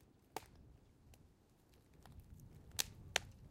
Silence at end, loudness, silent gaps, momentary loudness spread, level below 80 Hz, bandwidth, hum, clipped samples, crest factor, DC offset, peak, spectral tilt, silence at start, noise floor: 0 s; -44 LUFS; none; 25 LU; -66 dBFS; 16.5 kHz; none; under 0.1%; 38 dB; under 0.1%; -14 dBFS; -1 dB/octave; 0 s; -70 dBFS